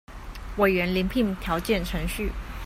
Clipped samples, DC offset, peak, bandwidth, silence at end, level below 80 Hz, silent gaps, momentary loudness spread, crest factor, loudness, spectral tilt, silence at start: under 0.1%; under 0.1%; -8 dBFS; 16 kHz; 0 s; -36 dBFS; none; 13 LU; 18 dB; -26 LUFS; -5.5 dB/octave; 0.1 s